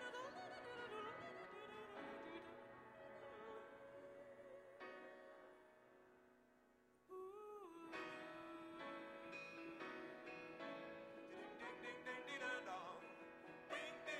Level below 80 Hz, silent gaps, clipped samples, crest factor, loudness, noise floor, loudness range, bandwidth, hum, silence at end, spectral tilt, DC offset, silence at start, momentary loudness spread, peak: -88 dBFS; none; under 0.1%; 20 dB; -54 LUFS; -75 dBFS; 9 LU; 13.5 kHz; none; 0 s; -4 dB/octave; under 0.1%; 0 s; 10 LU; -36 dBFS